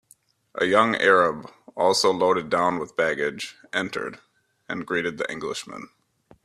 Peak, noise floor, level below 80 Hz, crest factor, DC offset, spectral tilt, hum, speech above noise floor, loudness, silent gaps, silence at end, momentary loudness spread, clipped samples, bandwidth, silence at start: -2 dBFS; -59 dBFS; -66 dBFS; 22 dB; under 0.1%; -3.5 dB/octave; none; 36 dB; -23 LUFS; none; 0.6 s; 17 LU; under 0.1%; 14.5 kHz; 0.55 s